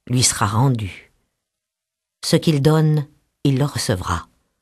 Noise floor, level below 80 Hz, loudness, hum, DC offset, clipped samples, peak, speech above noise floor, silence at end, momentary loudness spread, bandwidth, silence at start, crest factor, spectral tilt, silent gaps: -83 dBFS; -46 dBFS; -19 LUFS; none; under 0.1%; under 0.1%; -2 dBFS; 65 dB; 0.4 s; 11 LU; 13 kHz; 0.1 s; 18 dB; -5 dB/octave; none